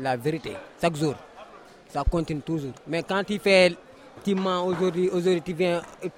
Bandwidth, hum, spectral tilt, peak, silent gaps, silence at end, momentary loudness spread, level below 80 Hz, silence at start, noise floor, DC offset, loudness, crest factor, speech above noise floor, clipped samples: 16 kHz; none; -5.5 dB/octave; -6 dBFS; none; 0.1 s; 14 LU; -40 dBFS; 0 s; -48 dBFS; under 0.1%; -25 LUFS; 18 dB; 23 dB; under 0.1%